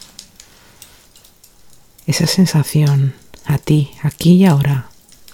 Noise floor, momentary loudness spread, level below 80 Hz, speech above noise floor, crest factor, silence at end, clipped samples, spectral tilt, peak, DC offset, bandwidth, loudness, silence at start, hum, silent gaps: -47 dBFS; 12 LU; -46 dBFS; 34 dB; 16 dB; 0.45 s; under 0.1%; -6 dB/octave; 0 dBFS; under 0.1%; 17 kHz; -14 LUFS; 2.05 s; none; none